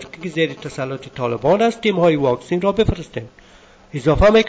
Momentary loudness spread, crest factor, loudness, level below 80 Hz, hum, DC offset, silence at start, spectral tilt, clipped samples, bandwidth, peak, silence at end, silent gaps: 12 LU; 14 dB; -19 LUFS; -34 dBFS; none; under 0.1%; 0 s; -6.5 dB/octave; under 0.1%; 8 kHz; -4 dBFS; 0 s; none